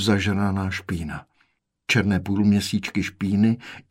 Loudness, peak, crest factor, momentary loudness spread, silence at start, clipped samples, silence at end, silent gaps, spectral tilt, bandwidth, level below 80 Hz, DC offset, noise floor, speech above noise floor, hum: -23 LUFS; -6 dBFS; 16 dB; 10 LU; 0 s; under 0.1%; 0.1 s; none; -5.5 dB/octave; 15.5 kHz; -50 dBFS; under 0.1%; -67 dBFS; 45 dB; none